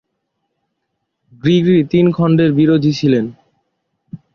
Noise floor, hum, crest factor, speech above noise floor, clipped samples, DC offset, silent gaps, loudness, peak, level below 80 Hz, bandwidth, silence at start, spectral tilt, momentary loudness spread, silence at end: -73 dBFS; none; 14 dB; 60 dB; under 0.1%; under 0.1%; none; -13 LUFS; -2 dBFS; -52 dBFS; 6.8 kHz; 1.45 s; -8 dB/octave; 6 LU; 0.2 s